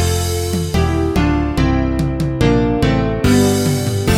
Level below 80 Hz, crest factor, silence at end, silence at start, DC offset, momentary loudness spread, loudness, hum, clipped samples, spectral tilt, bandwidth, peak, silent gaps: -24 dBFS; 14 dB; 0 s; 0 s; under 0.1%; 5 LU; -16 LUFS; none; under 0.1%; -6 dB/octave; 17 kHz; 0 dBFS; none